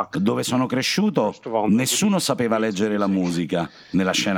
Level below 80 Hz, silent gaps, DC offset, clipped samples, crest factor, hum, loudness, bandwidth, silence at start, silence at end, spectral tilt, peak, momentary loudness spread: -60 dBFS; none; under 0.1%; under 0.1%; 16 dB; none; -21 LUFS; 19 kHz; 0 s; 0 s; -4.5 dB/octave; -4 dBFS; 5 LU